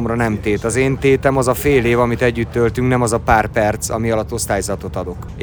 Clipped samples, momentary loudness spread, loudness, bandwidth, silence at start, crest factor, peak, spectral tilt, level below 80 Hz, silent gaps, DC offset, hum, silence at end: under 0.1%; 6 LU; -17 LUFS; over 20 kHz; 0 s; 16 dB; 0 dBFS; -5.5 dB/octave; -32 dBFS; none; under 0.1%; none; 0 s